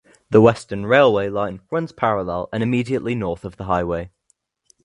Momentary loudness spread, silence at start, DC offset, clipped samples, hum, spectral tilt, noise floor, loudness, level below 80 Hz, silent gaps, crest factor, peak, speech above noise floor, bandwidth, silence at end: 13 LU; 0.3 s; under 0.1%; under 0.1%; none; -7 dB/octave; -66 dBFS; -20 LUFS; -46 dBFS; none; 20 dB; 0 dBFS; 47 dB; 11 kHz; 0.75 s